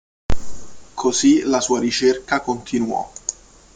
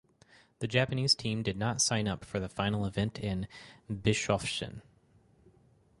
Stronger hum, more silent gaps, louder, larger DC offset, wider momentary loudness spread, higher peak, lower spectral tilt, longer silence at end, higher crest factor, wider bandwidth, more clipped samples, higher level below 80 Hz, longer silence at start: neither; neither; first, -19 LUFS vs -31 LUFS; neither; about the same, 15 LU vs 14 LU; first, -2 dBFS vs -12 dBFS; about the same, -3.5 dB/octave vs -4 dB/octave; second, 0.45 s vs 1.2 s; second, 16 dB vs 22 dB; second, 9.6 kHz vs 11.5 kHz; neither; first, -36 dBFS vs -54 dBFS; second, 0.3 s vs 0.6 s